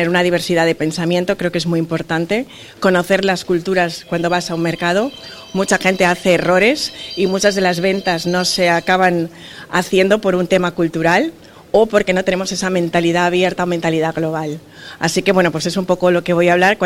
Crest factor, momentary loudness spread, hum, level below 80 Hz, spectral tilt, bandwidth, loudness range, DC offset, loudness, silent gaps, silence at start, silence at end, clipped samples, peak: 16 dB; 7 LU; none; -48 dBFS; -4.5 dB/octave; 16.5 kHz; 2 LU; under 0.1%; -16 LUFS; none; 0 s; 0 s; under 0.1%; 0 dBFS